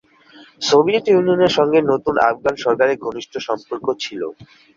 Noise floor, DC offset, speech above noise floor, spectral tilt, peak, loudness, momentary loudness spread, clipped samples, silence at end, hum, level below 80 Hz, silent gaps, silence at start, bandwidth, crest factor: -46 dBFS; under 0.1%; 29 dB; -4.5 dB/octave; -2 dBFS; -17 LUFS; 12 LU; under 0.1%; 0.35 s; none; -56 dBFS; none; 0.6 s; 7.6 kHz; 16 dB